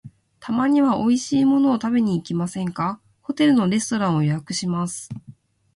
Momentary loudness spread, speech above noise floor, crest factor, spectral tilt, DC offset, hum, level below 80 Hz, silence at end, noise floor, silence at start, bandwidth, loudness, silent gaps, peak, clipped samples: 14 LU; 28 dB; 14 dB; -5.5 dB/octave; under 0.1%; none; -58 dBFS; 0.45 s; -48 dBFS; 0.05 s; 11.5 kHz; -21 LUFS; none; -6 dBFS; under 0.1%